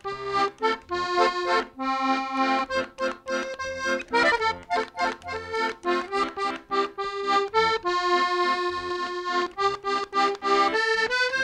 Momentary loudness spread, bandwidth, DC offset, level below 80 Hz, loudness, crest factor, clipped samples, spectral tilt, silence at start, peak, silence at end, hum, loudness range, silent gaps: 7 LU; 11.5 kHz; under 0.1%; -58 dBFS; -25 LUFS; 16 dB; under 0.1%; -3 dB/octave; 0.05 s; -8 dBFS; 0 s; none; 2 LU; none